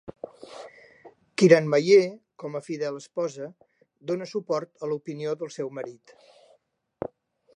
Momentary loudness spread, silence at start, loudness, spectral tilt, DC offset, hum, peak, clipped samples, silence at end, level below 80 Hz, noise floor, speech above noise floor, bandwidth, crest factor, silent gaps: 23 LU; 0.5 s; -25 LUFS; -6 dB/octave; under 0.1%; none; -4 dBFS; under 0.1%; 0.5 s; -72 dBFS; -67 dBFS; 42 dB; 10.5 kHz; 24 dB; none